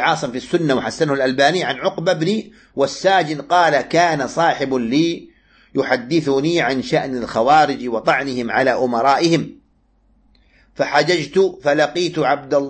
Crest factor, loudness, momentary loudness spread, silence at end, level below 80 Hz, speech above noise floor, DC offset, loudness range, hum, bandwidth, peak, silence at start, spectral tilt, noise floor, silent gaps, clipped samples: 16 dB; -17 LUFS; 7 LU; 0 s; -54 dBFS; 41 dB; under 0.1%; 2 LU; none; 8.8 kHz; -2 dBFS; 0 s; -5 dB/octave; -58 dBFS; none; under 0.1%